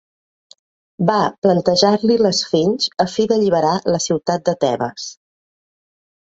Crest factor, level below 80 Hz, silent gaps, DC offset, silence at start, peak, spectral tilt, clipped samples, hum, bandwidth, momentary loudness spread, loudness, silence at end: 18 dB; -58 dBFS; 1.38-1.42 s; under 0.1%; 1 s; 0 dBFS; -5 dB/octave; under 0.1%; none; 8 kHz; 6 LU; -17 LUFS; 1.2 s